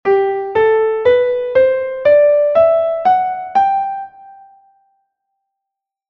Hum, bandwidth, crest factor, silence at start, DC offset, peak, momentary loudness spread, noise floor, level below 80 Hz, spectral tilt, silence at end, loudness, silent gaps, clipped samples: none; 6 kHz; 12 dB; 0.05 s; under 0.1%; -2 dBFS; 6 LU; -82 dBFS; -54 dBFS; -6.5 dB/octave; 1.75 s; -14 LUFS; none; under 0.1%